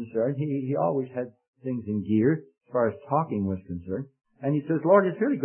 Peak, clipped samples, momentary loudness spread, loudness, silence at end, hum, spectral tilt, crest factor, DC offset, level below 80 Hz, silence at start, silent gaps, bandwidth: -6 dBFS; under 0.1%; 14 LU; -27 LUFS; 0 s; none; -13 dB/octave; 20 dB; under 0.1%; -64 dBFS; 0 s; 1.48-1.53 s; 3.3 kHz